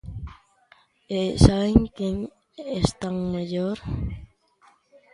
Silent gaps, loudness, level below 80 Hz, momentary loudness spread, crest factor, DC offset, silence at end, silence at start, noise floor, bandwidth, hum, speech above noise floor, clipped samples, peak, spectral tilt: none; -24 LUFS; -34 dBFS; 20 LU; 24 dB; under 0.1%; 0.9 s; 0.05 s; -60 dBFS; 11.5 kHz; none; 37 dB; under 0.1%; 0 dBFS; -7 dB/octave